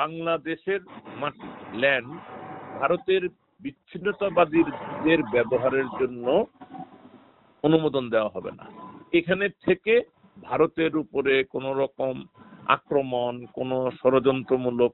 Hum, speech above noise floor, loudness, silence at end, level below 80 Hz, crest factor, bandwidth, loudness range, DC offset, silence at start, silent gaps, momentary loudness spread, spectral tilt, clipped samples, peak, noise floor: none; 30 dB; -25 LUFS; 0 s; -62 dBFS; 22 dB; 4.2 kHz; 3 LU; under 0.1%; 0 s; none; 18 LU; -4 dB/octave; under 0.1%; -4 dBFS; -55 dBFS